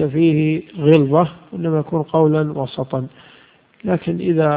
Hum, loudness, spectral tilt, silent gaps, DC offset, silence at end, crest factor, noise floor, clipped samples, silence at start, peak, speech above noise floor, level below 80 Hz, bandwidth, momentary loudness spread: none; -18 LUFS; -11 dB/octave; none; under 0.1%; 0 s; 16 dB; -50 dBFS; under 0.1%; 0 s; 0 dBFS; 33 dB; -56 dBFS; 4.8 kHz; 11 LU